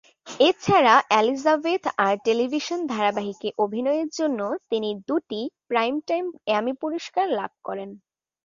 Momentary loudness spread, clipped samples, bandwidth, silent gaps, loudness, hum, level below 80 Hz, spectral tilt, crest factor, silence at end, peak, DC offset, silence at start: 12 LU; under 0.1%; 7.4 kHz; none; -23 LUFS; none; -66 dBFS; -4.5 dB/octave; 20 dB; 0.5 s; -2 dBFS; under 0.1%; 0.25 s